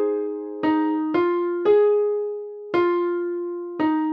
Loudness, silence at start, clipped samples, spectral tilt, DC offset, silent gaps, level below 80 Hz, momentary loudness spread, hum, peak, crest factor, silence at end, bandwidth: -22 LUFS; 0 s; under 0.1%; -8 dB/octave; under 0.1%; none; -68 dBFS; 11 LU; none; -8 dBFS; 14 dB; 0 s; 5.4 kHz